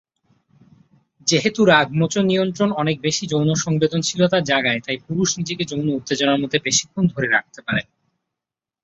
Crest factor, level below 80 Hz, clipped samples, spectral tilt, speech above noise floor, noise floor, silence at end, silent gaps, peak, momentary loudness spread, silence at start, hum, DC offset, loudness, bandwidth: 20 dB; -58 dBFS; under 0.1%; -4 dB/octave; 68 dB; -87 dBFS; 1 s; none; -2 dBFS; 8 LU; 1.25 s; none; under 0.1%; -19 LUFS; 8 kHz